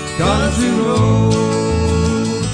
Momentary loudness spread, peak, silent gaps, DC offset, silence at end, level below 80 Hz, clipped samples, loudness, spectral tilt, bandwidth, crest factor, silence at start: 3 LU; -4 dBFS; none; under 0.1%; 0 s; -28 dBFS; under 0.1%; -15 LUFS; -6 dB/octave; 10 kHz; 12 dB; 0 s